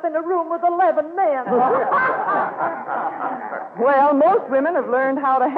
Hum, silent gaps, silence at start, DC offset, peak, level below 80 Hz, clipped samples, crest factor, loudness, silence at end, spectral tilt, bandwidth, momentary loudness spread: none; none; 0 s; under 0.1%; -8 dBFS; -76 dBFS; under 0.1%; 12 dB; -19 LUFS; 0 s; -8.5 dB/octave; 4.9 kHz; 9 LU